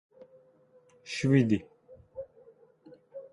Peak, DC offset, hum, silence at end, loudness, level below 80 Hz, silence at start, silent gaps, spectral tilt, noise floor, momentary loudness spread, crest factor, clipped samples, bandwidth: -12 dBFS; under 0.1%; none; 0.05 s; -28 LUFS; -64 dBFS; 1.05 s; none; -7 dB/octave; -62 dBFS; 24 LU; 22 dB; under 0.1%; 11 kHz